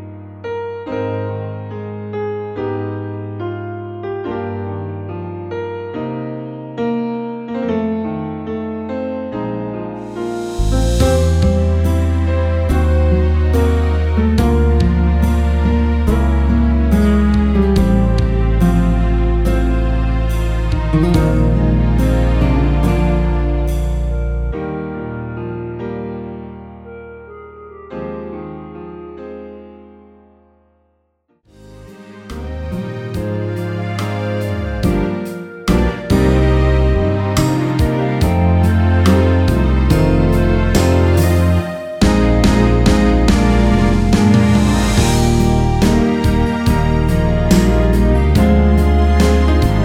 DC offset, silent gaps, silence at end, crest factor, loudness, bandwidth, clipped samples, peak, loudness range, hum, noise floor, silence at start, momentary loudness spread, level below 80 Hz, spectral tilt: under 0.1%; none; 0 s; 14 dB; -16 LUFS; 16 kHz; under 0.1%; 0 dBFS; 15 LU; none; -62 dBFS; 0 s; 14 LU; -18 dBFS; -7 dB/octave